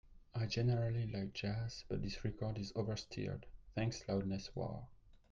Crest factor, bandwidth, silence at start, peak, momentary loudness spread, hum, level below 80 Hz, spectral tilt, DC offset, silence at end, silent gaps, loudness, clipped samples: 16 dB; 7.4 kHz; 0.05 s; -26 dBFS; 10 LU; none; -56 dBFS; -6.5 dB/octave; under 0.1%; 0.15 s; none; -41 LUFS; under 0.1%